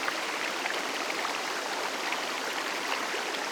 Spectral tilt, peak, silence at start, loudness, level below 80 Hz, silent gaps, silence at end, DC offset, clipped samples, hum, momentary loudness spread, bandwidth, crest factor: -0.5 dB/octave; -12 dBFS; 0 s; -31 LUFS; -78 dBFS; none; 0 s; under 0.1%; under 0.1%; none; 1 LU; over 20 kHz; 20 dB